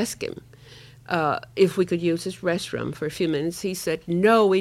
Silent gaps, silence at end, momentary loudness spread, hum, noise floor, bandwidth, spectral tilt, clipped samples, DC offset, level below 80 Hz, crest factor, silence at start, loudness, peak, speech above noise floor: none; 0 s; 11 LU; none; -47 dBFS; 15.5 kHz; -5.5 dB/octave; under 0.1%; under 0.1%; -58 dBFS; 18 dB; 0 s; -24 LUFS; -4 dBFS; 24 dB